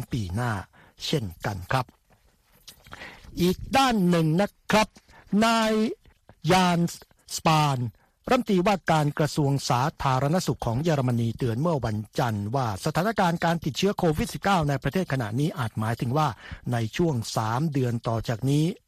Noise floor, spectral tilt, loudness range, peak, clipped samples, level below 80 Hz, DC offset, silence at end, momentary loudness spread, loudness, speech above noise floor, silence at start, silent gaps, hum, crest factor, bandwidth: -62 dBFS; -6 dB/octave; 3 LU; -8 dBFS; under 0.1%; -48 dBFS; under 0.1%; 0.1 s; 9 LU; -25 LUFS; 38 dB; 0 s; none; none; 18 dB; 15 kHz